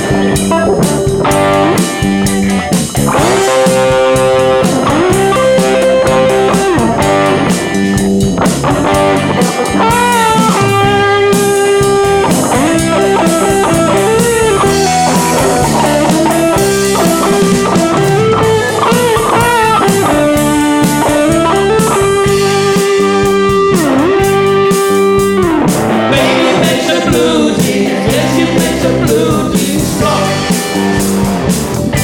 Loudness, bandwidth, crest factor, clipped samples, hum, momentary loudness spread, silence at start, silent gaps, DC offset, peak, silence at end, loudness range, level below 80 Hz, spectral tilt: -10 LUFS; 18.5 kHz; 10 dB; under 0.1%; none; 3 LU; 0 s; none; under 0.1%; 0 dBFS; 0 s; 1 LU; -30 dBFS; -4.5 dB/octave